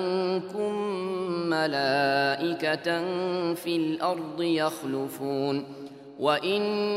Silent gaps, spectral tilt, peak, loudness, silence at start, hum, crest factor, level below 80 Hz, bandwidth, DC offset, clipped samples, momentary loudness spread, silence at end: none; -5.5 dB/octave; -10 dBFS; -27 LUFS; 0 s; none; 18 dB; -78 dBFS; 16 kHz; under 0.1%; under 0.1%; 7 LU; 0 s